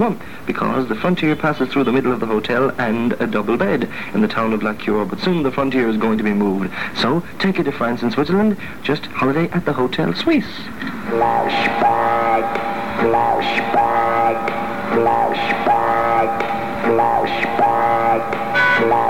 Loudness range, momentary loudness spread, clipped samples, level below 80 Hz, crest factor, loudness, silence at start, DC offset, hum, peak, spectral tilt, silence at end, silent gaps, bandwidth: 2 LU; 6 LU; under 0.1%; -48 dBFS; 14 dB; -18 LUFS; 0 s; 2%; none; -4 dBFS; -6.5 dB/octave; 0 s; none; 17 kHz